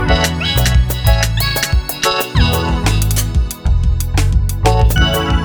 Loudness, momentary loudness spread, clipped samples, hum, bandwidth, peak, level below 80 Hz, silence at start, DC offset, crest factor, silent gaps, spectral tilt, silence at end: -15 LUFS; 4 LU; under 0.1%; none; over 20 kHz; 0 dBFS; -16 dBFS; 0 s; under 0.1%; 12 dB; none; -4.5 dB/octave; 0 s